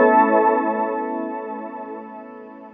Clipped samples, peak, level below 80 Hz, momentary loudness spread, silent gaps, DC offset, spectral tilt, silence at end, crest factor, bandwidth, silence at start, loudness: under 0.1%; -4 dBFS; -74 dBFS; 22 LU; none; under 0.1%; -5 dB/octave; 0.05 s; 16 dB; 3.7 kHz; 0 s; -20 LUFS